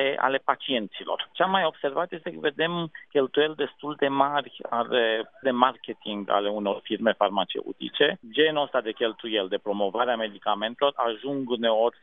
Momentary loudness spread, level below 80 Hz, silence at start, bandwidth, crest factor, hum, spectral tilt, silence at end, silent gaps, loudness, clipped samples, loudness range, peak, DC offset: 8 LU; -80 dBFS; 0 s; 4 kHz; 24 dB; none; -8 dB/octave; 0.1 s; none; -26 LUFS; under 0.1%; 1 LU; -2 dBFS; under 0.1%